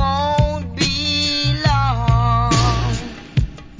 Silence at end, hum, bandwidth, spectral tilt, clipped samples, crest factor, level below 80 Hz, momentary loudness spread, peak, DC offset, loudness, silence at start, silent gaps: 0.05 s; none; 7.6 kHz; -5 dB/octave; under 0.1%; 14 dB; -26 dBFS; 7 LU; -2 dBFS; under 0.1%; -18 LUFS; 0 s; none